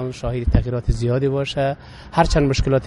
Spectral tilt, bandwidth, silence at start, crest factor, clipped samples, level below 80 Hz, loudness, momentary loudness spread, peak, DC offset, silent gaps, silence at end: -6.5 dB/octave; 11.5 kHz; 0 s; 18 dB; under 0.1%; -26 dBFS; -20 LUFS; 7 LU; 0 dBFS; under 0.1%; none; 0 s